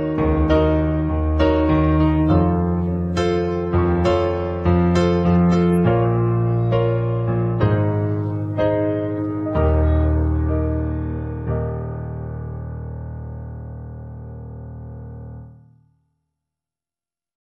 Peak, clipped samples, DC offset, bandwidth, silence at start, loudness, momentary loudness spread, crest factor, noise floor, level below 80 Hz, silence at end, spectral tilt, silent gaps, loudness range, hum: -4 dBFS; under 0.1%; under 0.1%; 8 kHz; 0 s; -19 LUFS; 18 LU; 16 dB; under -90 dBFS; -30 dBFS; 1.95 s; -9 dB/octave; none; 17 LU; none